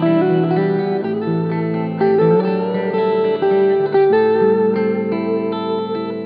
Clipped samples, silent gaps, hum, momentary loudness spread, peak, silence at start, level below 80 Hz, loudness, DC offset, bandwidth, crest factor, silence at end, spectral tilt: under 0.1%; none; none; 7 LU; -4 dBFS; 0 s; -70 dBFS; -17 LUFS; under 0.1%; 5.2 kHz; 12 dB; 0 s; -11 dB/octave